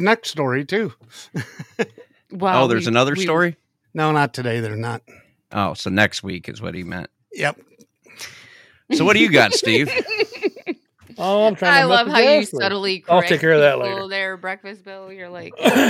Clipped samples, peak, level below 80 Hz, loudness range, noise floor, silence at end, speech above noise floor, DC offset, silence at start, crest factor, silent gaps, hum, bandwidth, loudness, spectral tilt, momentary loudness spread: under 0.1%; 0 dBFS; -62 dBFS; 8 LU; -50 dBFS; 0 s; 32 dB; under 0.1%; 0 s; 18 dB; none; none; 16 kHz; -18 LUFS; -4.5 dB/octave; 20 LU